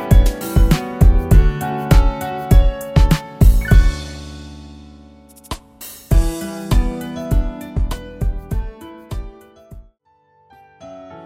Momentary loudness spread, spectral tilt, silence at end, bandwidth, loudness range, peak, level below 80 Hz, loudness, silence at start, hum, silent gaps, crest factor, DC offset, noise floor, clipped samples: 19 LU; -6.5 dB/octave; 0 s; 16 kHz; 12 LU; 0 dBFS; -18 dBFS; -18 LUFS; 0 s; none; none; 16 dB; under 0.1%; -58 dBFS; under 0.1%